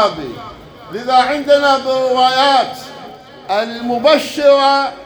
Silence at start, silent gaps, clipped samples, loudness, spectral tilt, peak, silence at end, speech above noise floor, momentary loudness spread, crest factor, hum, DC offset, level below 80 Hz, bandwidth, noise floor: 0 s; none; under 0.1%; -13 LUFS; -3.5 dB/octave; 0 dBFS; 0 s; 21 dB; 19 LU; 14 dB; none; under 0.1%; -52 dBFS; over 20 kHz; -35 dBFS